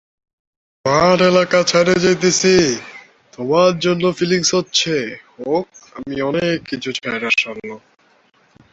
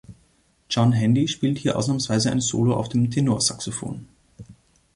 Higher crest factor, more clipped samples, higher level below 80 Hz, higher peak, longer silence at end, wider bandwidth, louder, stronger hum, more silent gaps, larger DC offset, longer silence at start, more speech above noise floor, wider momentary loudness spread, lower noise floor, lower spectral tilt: about the same, 16 dB vs 16 dB; neither; about the same, -52 dBFS vs -54 dBFS; first, -2 dBFS vs -6 dBFS; first, 0.95 s vs 0.45 s; second, 8 kHz vs 11.5 kHz; first, -16 LUFS vs -22 LUFS; neither; neither; neither; first, 0.85 s vs 0.1 s; about the same, 39 dB vs 40 dB; first, 16 LU vs 10 LU; second, -56 dBFS vs -62 dBFS; about the same, -4 dB/octave vs -5 dB/octave